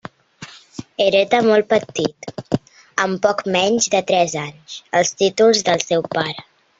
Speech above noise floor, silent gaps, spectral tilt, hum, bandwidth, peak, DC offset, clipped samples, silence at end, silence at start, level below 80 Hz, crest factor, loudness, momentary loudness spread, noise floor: 23 dB; none; -3.5 dB/octave; none; 8 kHz; 0 dBFS; under 0.1%; under 0.1%; 0.4 s; 0.4 s; -58 dBFS; 18 dB; -18 LUFS; 19 LU; -41 dBFS